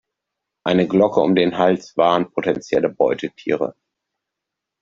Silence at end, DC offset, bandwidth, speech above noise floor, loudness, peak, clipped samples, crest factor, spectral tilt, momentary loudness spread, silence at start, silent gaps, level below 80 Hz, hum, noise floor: 1.1 s; under 0.1%; 7.6 kHz; 65 dB; -19 LUFS; -2 dBFS; under 0.1%; 18 dB; -6.5 dB/octave; 8 LU; 0.65 s; none; -60 dBFS; none; -83 dBFS